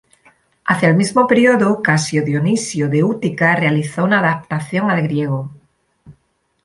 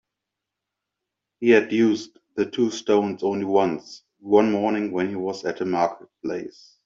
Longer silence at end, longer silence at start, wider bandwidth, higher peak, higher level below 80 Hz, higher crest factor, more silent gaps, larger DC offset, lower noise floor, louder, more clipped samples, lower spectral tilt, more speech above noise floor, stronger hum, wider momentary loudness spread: first, 0.5 s vs 0.35 s; second, 0.65 s vs 1.4 s; first, 11.5 kHz vs 7.6 kHz; about the same, -2 dBFS vs -4 dBFS; first, -56 dBFS vs -68 dBFS; about the same, 16 dB vs 20 dB; neither; neither; second, -63 dBFS vs -84 dBFS; first, -16 LUFS vs -23 LUFS; neither; about the same, -6 dB/octave vs -6 dB/octave; second, 48 dB vs 62 dB; neither; second, 9 LU vs 14 LU